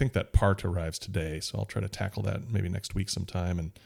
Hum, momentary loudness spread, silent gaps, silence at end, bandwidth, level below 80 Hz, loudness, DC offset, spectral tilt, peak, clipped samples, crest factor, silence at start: none; 7 LU; none; 0.15 s; 15 kHz; -38 dBFS; -31 LUFS; under 0.1%; -5.5 dB/octave; -10 dBFS; under 0.1%; 20 dB; 0 s